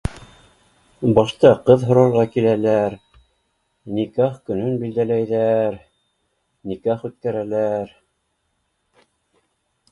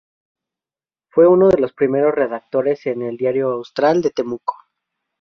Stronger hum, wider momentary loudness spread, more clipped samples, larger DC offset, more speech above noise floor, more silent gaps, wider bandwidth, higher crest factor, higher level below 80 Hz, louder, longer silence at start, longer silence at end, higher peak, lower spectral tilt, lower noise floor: neither; first, 14 LU vs 11 LU; neither; neither; second, 53 dB vs over 74 dB; neither; first, 11.5 kHz vs 6.6 kHz; about the same, 20 dB vs 16 dB; first, -46 dBFS vs -54 dBFS; about the same, -19 LUFS vs -17 LUFS; second, 0.05 s vs 1.15 s; first, 2.05 s vs 0.65 s; about the same, 0 dBFS vs -2 dBFS; about the same, -8 dB/octave vs -7.5 dB/octave; second, -70 dBFS vs under -90 dBFS